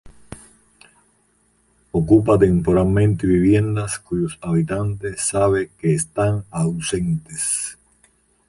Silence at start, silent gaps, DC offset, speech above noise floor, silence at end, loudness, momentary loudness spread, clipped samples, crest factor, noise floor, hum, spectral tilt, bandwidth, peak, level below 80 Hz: 0.05 s; none; under 0.1%; 43 dB; 0.75 s; -19 LUFS; 9 LU; under 0.1%; 18 dB; -61 dBFS; none; -6 dB/octave; 11.5 kHz; -2 dBFS; -40 dBFS